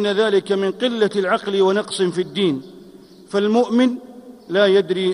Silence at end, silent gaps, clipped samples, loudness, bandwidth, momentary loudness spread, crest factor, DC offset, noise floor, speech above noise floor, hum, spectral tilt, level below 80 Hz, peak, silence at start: 0 s; none; under 0.1%; -19 LUFS; 11.5 kHz; 6 LU; 14 dB; under 0.1%; -43 dBFS; 25 dB; none; -5.5 dB/octave; -66 dBFS; -4 dBFS; 0 s